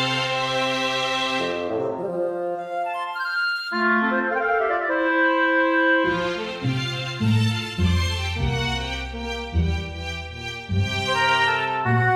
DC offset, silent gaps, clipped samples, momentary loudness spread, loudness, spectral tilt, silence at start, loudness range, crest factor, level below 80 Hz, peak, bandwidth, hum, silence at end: under 0.1%; none; under 0.1%; 9 LU; -23 LUFS; -5 dB/octave; 0 s; 4 LU; 14 dB; -38 dBFS; -8 dBFS; 14 kHz; none; 0 s